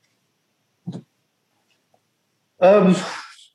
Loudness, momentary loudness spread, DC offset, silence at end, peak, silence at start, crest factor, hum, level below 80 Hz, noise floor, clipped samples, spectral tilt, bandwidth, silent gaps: -17 LUFS; 25 LU; under 0.1%; 0.3 s; -4 dBFS; 0.85 s; 18 dB; none; -74 dBFS; -70 dBFS; under 0.1%; -6.5 dB/octave; 11 kHz; none